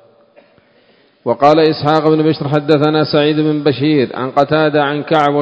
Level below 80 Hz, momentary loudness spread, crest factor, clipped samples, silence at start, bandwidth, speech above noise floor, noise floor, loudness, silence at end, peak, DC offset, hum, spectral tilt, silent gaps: -54 dBFS; 4 LU; 14 dB; 0.3%; 1.25 s; 8 kHz; 39 dB; -51 dBFS; -13 LUFS; 0 s; 0 dBFS; under 0.1%; none; -8 dB/octave; none